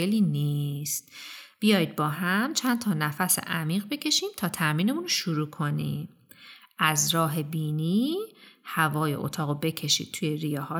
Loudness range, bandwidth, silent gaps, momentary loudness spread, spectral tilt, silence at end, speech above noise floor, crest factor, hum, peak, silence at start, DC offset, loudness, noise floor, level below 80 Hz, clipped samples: 2 LU; over 20 kHz; none; 9 LU; -4 dB/octave; 0 s; 24 dB; 20 dB; none; -6 dBFS; 0 s; under 0.1%; -27 LUFS; -51 dBFS; -72 dBFS; under 0.1%